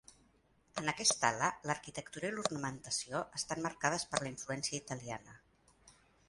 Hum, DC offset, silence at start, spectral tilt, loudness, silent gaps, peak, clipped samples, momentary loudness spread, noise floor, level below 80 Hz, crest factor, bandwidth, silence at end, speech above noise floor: none; under 0.1%; 0.75 s; -2.5 dB/octave; -37 LUFS; none; -14 dBFS; under 0.1%; 12 LU; -71 dBFS; -70 dBFS; 26 dB; 11.5 kHz; 0.4 s; 33 dB